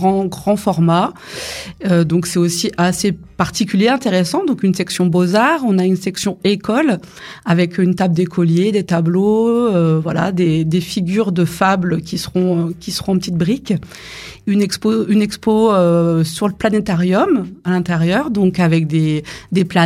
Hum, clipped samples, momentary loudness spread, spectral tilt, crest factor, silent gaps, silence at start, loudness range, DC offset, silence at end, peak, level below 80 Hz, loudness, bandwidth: none; under 0.1%; 7 LU; -6 dB/octave; 14 dB; none; 0 s; 2 LU; under 0.1%; 0 s; 0 dBFS; -48 dBFS; -16 LUFS; 15 kHz